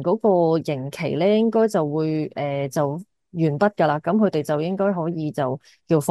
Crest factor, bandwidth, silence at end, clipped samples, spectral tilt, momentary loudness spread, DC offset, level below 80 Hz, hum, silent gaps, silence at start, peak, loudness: 16 dB; 12.5 kHz; 0 s; under 0.1%; -7 dB/octave; 8 LU; under 0.1%; -66 dBFS; none; none; 0 s; -6 dBFS; -22 LUFS